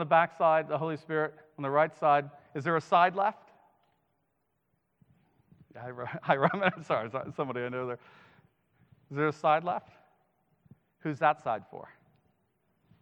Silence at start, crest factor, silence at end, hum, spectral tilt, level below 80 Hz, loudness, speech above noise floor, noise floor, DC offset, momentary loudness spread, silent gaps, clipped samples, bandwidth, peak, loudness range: 0 s; 24 dB; 1.15 s; none; -7 dB/octave; -78 dBFS; -30 LUFS; 49 dB; -78 dBFS; under 0.1%; 15 LU; none; under 0.1%; 8.6 kHz; -8 dBFS; 7 LU